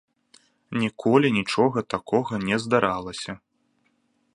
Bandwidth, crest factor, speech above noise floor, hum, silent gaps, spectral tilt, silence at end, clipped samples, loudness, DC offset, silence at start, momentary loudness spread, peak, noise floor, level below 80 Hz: 11.5 kHz; 22 dB; 46 dB; none; none; -6 dB/octave; 1 s; under 0.1%; -24 LUFS; under 0.1%; 0.7 s; 13 LU; -2 dBFS; -69 dBFS; -60 dBFS